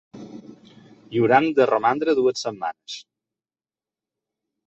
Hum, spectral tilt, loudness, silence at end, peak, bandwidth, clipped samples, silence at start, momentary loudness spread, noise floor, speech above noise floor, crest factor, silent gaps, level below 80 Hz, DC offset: none; -5.5 dB/octave; -21 LUFS; 1.65 s; -2 dBFS; 8.2 kHz; under 0.1%; 0.15 s; 21 LU; under -90 dBFS; over 70 dB; 22 dB; none; -66 dBFS; under 0.1%